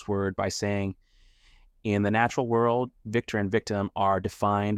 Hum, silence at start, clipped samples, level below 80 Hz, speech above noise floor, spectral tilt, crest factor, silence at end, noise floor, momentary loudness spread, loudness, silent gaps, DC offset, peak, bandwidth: none; 0 s; under 0.1%; -58 dBFS; 32 dB; -6 dB/octave; 18 dB; 0 s; -58 dBFS; 7 LU; -27 LUFS; none; under 0.1%; -10 dBFS; 14.5 kHz